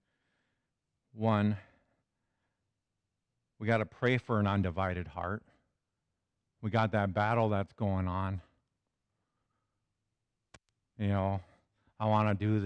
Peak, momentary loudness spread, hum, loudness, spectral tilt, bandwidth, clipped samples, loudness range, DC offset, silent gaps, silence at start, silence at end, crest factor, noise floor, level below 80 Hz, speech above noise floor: -16 dBFS; 10 LU; none; -33 LUFS; -8.5 dB/octave; 6.6 kHz; under 0.1%; 7 LU; under 0.1%; none; 1.15 s; 0 s; 18 dB; -86 dBFS; -62 dBFS; 55 dB